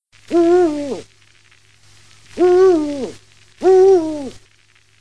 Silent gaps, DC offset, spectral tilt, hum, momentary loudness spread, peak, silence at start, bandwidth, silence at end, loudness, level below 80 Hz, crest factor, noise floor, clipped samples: none; 0.5%; -6 dB/octave; none; 19 LU; -4 dBFS; 0.3 s; 10 kHz; 0.7 s; -14 LUFS; -54 dBFS; 14 dB; -54 dBFS; under 0.1%